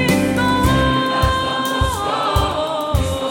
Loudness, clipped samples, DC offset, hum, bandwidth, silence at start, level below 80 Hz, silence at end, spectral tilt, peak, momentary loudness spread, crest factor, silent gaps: -18 LUFS; under 0.1%; under 0.1%; none; 17 kHz; 0 s; -26 dBFS; 0 s; -5 dB/octave; -2 dBFS; 5 LU; 16 dB; none